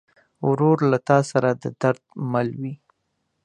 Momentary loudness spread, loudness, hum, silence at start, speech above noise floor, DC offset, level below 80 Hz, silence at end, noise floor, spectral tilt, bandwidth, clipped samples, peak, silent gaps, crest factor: 12 LU; -22 LUFS; none; 0.4 s; 53 dB; under 0.1%; -64 dBFS; 0.7 s; -74 dBFS; -7.5 dB/octave; 10 kHz; under 0.1%; -2 dBFS; none; 20 dB